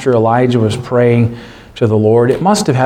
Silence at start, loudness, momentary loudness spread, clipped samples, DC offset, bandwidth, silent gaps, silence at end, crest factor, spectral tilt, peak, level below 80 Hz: 0 s; -12 LUFS; 7 LU; under 0.1%; under 0.1%; 13.5 kHz; none; 0 s; 12 dB; -6.5 dB/octave; 0 dBFS; -44 dBFS